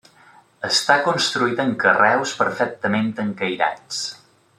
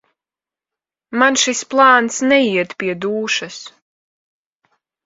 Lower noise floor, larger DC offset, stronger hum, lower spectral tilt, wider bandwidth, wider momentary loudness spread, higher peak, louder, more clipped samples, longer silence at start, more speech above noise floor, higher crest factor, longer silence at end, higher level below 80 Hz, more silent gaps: second, -51 dBFS vs -90 dBFS; neither; neither; about the same, -3 dB/octave vs -2.5 dB/octave; first, 13.5 kHz vs 8 kHz; about the same, 11 LU vs 12 LU; about the same, -2 dBFS vs 0 dBFS; second, -20 LUFS vs -15 LUFS; neither; second, 0.6 s vs 1.1 s; second, 31 dB vs 74 dB; about the same, 20 dB vs 18 dB; second, 0.45 s vs 1.35 s; about the same, -68 dBFS vs -66 dBFS; neither